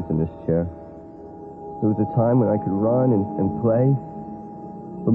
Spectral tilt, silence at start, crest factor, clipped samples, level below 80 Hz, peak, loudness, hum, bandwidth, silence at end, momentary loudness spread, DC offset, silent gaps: -13.5 dB/octave; 0 s; 14 dB; under 0.1%; -52 dBFS; -8 dBFS; -21 LUFS; none; 2.8 kHz; 0 s; 20 LU; under 0.1%; none